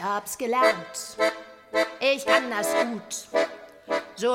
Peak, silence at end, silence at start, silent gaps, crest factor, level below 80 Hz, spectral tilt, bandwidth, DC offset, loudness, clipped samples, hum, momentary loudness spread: -6 dBFS; 0 s; 0 s; none; 20 dB; -70 dBFS; -2 dB/octave; 16 kHz; under 0.1%; -25 LUFS; under 0.1%; none; 9 LU